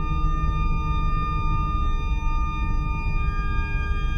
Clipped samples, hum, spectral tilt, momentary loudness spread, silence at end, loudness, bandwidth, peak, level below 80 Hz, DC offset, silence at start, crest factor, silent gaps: under 0.1%; none; -7 dB/octave; 2 LU; 0 s; -27 LUFS; 6.4 kHz; -10 dBFS; -24 dBFS; under 0.1%; 0 s; 12 dB; none